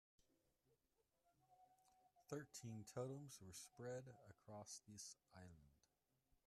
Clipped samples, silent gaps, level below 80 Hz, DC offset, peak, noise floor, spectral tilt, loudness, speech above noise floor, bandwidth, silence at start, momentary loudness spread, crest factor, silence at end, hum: under 0.1%; none; -86 dBFS; under 0.1%; -38 dBFS; -88 dBFS; -4.5 dB/octave; -56 LUFS; 32 dB; 14.5 kHz; 0.7 s; 13 LU; 22 dB; 0.7 s; none